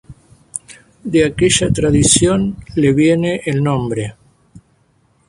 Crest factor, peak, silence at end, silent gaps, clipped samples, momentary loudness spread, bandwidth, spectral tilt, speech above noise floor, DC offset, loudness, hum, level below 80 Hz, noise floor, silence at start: 16 dB; 0 dBFS; 0.7 s; none; under 0.1%; 18 LU; 11.5 kHz; -4.5 dB/octave; 43 dB; under 0.1%; -14 LUFS; none; -36 dBFS; -57 dBFS; 0.1 s